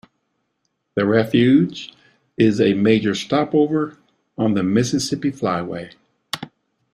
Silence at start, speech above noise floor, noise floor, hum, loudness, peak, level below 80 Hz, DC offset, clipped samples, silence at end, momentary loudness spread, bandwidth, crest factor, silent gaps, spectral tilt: 0.95 s; 55 dB; -72 dBFS; none; -19 LUFS; -4 dBFS; -56 dBFS; under 0.1%; under 0.1%; 0.45 s; 18 LU; 14.5 kHz; 16 dB; none; -6 dB/octave